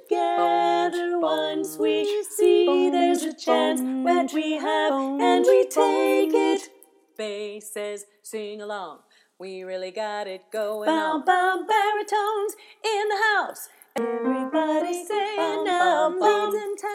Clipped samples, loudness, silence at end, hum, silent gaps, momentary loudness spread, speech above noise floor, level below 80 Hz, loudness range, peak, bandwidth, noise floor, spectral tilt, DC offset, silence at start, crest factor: under 0.1%; -23 LUFS; 0 s; none; none; 14 LU; 32 dB; under -90 dBFS; 10 LU; -6 dBFS; 16 kHz; -55 dBFS; -2.5 dB/octave; under 0.1%; 0.1 s; 16 dB